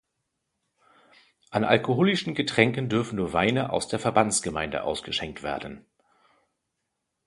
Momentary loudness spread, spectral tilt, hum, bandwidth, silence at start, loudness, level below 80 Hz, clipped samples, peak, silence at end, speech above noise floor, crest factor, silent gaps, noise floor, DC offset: 10 LU; -4.5 dB/octave; none; 11.5 kHz; 1.5 s; -25 LUFS; -54 dBFS; under 0.1%; -2 dBFS; 1.45 s; 55 dB; 24 dB; none; -81 dBFS; under 0.1%